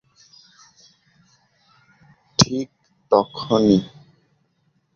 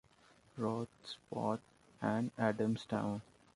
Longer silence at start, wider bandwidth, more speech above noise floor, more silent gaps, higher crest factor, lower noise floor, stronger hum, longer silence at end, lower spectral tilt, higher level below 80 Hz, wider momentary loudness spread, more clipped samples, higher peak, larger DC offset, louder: first, 2.4 s vs 0.55 s; second, 7.4 kHz vs 11.5 kHz; first, 48 dB vs 29 dB; neither; about the same, 22 dB vs 20 dB; about the same, -67 dBFS vs -67 dBFS; neither; first, 1.1 s vs 0.35 s; second, -5 dB/octave vs -7 dB/octave; first, -54 dBFS vs -72 dBFS; first, 14 LU vs 11 LU; neither; first, -2 dBFS vs -18 dBFS; neither; first, -19 LUFS vs -39 LUFS